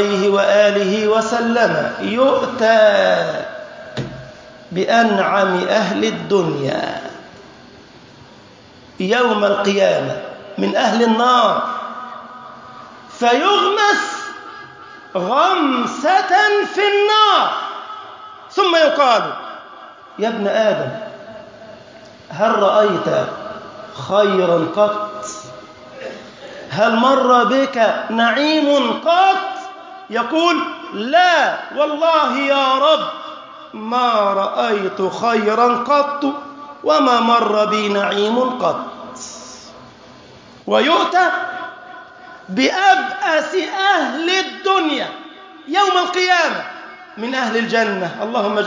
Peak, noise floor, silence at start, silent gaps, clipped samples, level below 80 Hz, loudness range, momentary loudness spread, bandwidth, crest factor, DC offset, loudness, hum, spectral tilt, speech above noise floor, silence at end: -2 dBFS; -43 dBFS; 0 s; none; under 0.1%; -62 dBFS; 5 LU; 20 LU; 7.6 kHz; 16 dB; under 0.1%; -16 LUFS; none; -4 dB/octave; 28 dB; 0 s